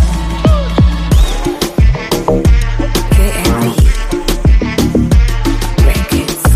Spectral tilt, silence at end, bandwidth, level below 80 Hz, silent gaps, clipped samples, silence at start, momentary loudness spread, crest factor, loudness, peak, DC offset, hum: -5.5 dB/octave; 0 s; 15.5 kHz; -12 dBFS; none; under 0.1%; 0 s; 4 LU; 10 dB; -12 LUFS; 0 dBFS; under 0.1%; none